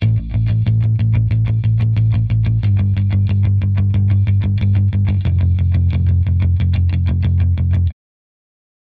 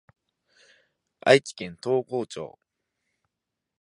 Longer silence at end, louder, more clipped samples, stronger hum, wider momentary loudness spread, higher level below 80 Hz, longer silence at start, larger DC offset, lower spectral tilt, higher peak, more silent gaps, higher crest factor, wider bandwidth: second, 1 s vs 1.35 s; first, -16 LUFS vs -24 LUFS; neither; neither; second, 1 LU vs 18 LU; first, -26 dBFS vs -70 dBFS; second, 0 s vs 1.25 s; first, 0.1% vs under 0.1%; first, -10.5 dB/octave vs -4.5 dB/octave; second, -6 dBFS vs -2 dBFS; neither; second, 8 dB vs 26 dB; second, 4.5 kHz vs 11.5 kHz